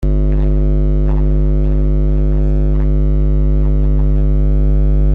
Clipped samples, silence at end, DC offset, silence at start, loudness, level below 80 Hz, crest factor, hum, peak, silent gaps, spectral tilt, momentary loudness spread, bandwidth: under 0.1%; 0 s; under 0.1%; 0 s; -15 LUFS; -12 dBFS; 6 dB; 50 Hz at -10 dBFS; -4 dBFS; none; -11.5 dB/octave; 1 LU; 2.4 kHz